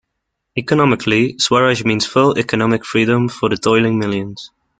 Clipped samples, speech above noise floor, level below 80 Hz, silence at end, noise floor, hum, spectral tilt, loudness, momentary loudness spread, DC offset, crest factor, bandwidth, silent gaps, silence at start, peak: under 0.1%; 60 dB; -50 dBFS; 0.35 s; -75 dBFS; none; -5 dB/octave; -15 LUFS; 9 LU; under 0.1%; 14 dB; 9.4 kHz; none; 0.55 s; -2 dBFS